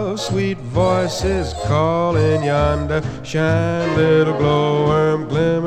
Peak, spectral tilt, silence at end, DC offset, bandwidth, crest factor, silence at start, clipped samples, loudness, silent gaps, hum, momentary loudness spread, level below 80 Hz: -4 dBFS; -6.5 dB/octave; 0 s; under 0.1%; 12 kHz; 14 dB; 0 s; under 0.1%; -18 LUFS; none; none; 6 LU; -34 dBFS